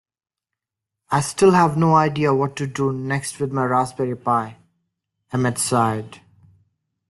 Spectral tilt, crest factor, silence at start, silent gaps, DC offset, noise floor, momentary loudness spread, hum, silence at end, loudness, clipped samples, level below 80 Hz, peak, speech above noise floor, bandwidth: -5.5 dB/octave; 18 dB; 1.1 s; none; under 0.1%; -86 dBFS; 9 LU; none; 0.9 s; -20 LUFS; under 0.1%; -58 dBFS; -4 dBFS; 67 dB; 12.5 kHz